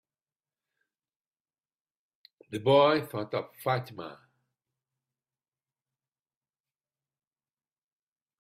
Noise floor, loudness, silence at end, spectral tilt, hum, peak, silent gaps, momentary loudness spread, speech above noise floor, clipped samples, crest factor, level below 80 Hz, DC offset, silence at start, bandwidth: under -90 dBFS; -27 LUFS; 4.3 s; -6.5 dB/octave; none; -10 dBFS; none; 20 LU; over 63 dB; under 0.1%; 24 dB; -78 dBFS; under 0.1%; 2.5 s; 15.5 kHz